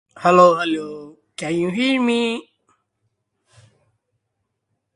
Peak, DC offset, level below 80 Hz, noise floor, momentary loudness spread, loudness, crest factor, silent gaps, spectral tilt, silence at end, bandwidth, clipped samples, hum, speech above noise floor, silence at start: 0 dBFS; under 0.1%; -66 dBFS; -76 dBFS; 20 LU; -17 LUFS; 20 dB; none; -5.5 dB/octave; 2.55 s; 11.5 kHz; under 0.1%; none; 59 dB; 0.15 s